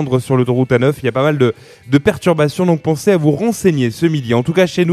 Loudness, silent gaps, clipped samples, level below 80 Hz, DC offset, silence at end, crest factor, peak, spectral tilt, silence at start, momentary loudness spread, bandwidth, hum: -15 LUFS; none; under 0.1%; -48 dBFS; under 0.1%; 0 s; 14 dB; 0 dBFS; -6.5 dB/octave; 0 s; 3 LU; 14 kHz; none